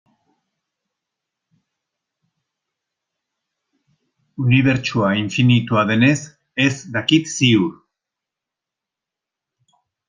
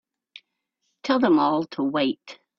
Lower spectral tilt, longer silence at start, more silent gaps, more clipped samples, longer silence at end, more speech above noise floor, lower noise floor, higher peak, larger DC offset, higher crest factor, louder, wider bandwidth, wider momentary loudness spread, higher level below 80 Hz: about the same, -5.5 dB/octave vs -6 dB/octave; first, 4.4 s vs 1.05 s; neither; neither; first, 2.35 s vs 0.25 s; first, 69 dB vs 54 dB; first, -86 dBFS vs -76 dBFS; first, 0 dBFS vs -8 dBFS; neither; about the same, 20 dB vs 18 dB; first, -17 LUFS vs -22 LUFS; first, 9.8 kHz vs 7 kHz; second, 9 LU vs 13 LU; first, -56 dBFS vs -68 dBFS